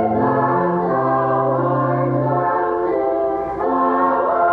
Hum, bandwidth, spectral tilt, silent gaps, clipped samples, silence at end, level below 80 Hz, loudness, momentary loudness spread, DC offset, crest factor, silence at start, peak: none; 4.7 kHz; -11 dB/octave; none; under 0.1%; 0 s; -50 dBFS; -18 LUFS; 3 LU; under 0.1%; 12 dB; 0 s; -6 dBFS